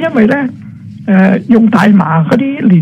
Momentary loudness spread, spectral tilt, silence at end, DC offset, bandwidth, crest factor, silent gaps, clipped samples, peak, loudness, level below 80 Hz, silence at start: 15 LU; -8.5 dB/octave; 0 s; under 0.1%; 9 kHz; 8 dB; none; 0.2%; 0 dBFS; -9 LUFS; -48 dBFS; 0 s